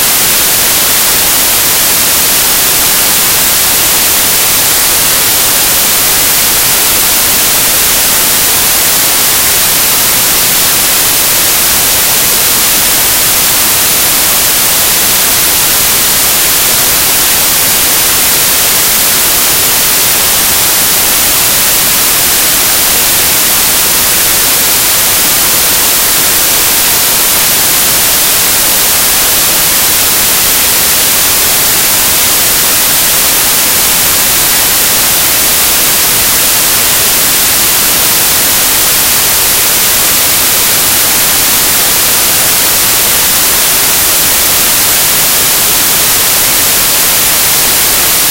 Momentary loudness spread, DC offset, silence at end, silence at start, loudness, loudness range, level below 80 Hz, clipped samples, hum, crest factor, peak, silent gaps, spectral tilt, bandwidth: 0 LU; under 0.1%; 0 s; 0 s; -5 LUFS; 0 LU; -32 dBFS; 0.9%; none; 8 dB; 0 dBFS; none; 0 dB/octave; over 20 kHz